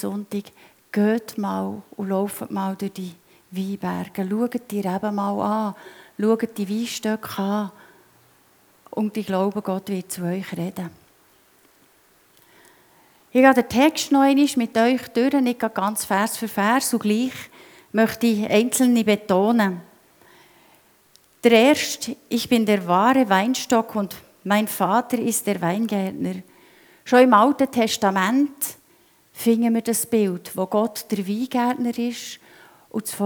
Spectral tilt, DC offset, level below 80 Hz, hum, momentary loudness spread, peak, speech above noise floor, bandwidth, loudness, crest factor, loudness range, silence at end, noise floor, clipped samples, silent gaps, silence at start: -4.5 dB/octave; under 0.1%; -66 dBFS; none; 13 LU; 0 dBFS; 37 dB; over 20 kHz; -21 LUFS; 22 dB; 8 LU; 0 s; -58 dBFS; under 0.1%; none; 0 s